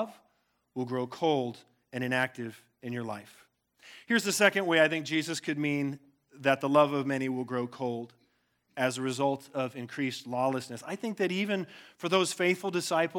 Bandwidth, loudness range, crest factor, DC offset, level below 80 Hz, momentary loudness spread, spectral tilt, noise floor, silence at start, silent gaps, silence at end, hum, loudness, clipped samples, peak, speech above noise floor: 18.5 kHz; 6 LU; 24 dB; under 0.1%; -84 dBFS; 15 LU; -4.5 dB/octave; -73 dBFS; 0 s; none; 0 s; none; -30 LUFS; under 0.1%; -8 dBFS; 43 dB